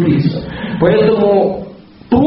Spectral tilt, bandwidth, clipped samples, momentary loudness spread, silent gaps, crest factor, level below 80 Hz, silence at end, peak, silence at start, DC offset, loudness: -7 dB/octave; 5.8 kHz; under 0.1%; 13 LU; none; 12 dB; -38 dBFS; 0 s; 0 dBFS; 0 s; under 0.1%; -13 LUFS